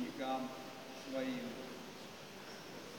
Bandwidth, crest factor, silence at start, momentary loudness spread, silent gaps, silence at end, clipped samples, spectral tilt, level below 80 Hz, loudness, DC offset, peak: 17 kHz; 18 dB; 0 s; 10 LU; none; 0 s; under 0.1%; -4 dB/octave; -80 dBFS; -45 LUFS; under 0.1%; -28 dBFS